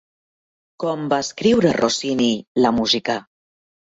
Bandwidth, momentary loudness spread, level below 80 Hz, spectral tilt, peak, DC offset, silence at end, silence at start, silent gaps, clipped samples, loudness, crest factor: 8 kHz; 9 LU; -54 dBFS; -4.5 dB/octave; -4 dBFS; under 0.1%; 0.75 s; 0.8 s; 2.47-2.55 s; under 0.1%; -19 LUFS; 18 dB